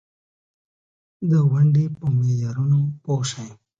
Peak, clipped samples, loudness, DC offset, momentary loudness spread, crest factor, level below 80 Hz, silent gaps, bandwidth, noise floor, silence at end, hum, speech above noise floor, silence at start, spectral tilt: -8 dBFS; under 0.1%; -21 LUFS; under 0.1%; 10 LU; 14 dB; -58 dBFS; none; 7.8 kHz; under -90 dBFS; 0.25 s; none; over 71 dB; 1.2 s; -7.5 dB/octave